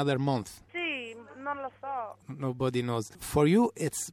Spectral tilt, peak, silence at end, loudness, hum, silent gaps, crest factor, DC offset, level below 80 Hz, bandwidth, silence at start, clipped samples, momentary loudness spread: -5.5 dB/octave; -12 dBFS; 0 s; -31 LUFS; 50 Hz at -65 dBFS; none; 18 dB; under 0.1%; -56 dBFS; 17 kHz; 0 s; under 0.1%; 14 LU